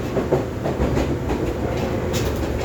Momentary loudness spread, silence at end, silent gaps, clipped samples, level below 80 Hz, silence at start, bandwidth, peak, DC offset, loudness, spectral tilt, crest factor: 2 LU; 0 s; none; under 0.1%; -30 dBFS; 0 s; over 20 kHz; -4 dBFS; under 0.1%; -23 LUFS; -6.5 dB/octave; 18 dB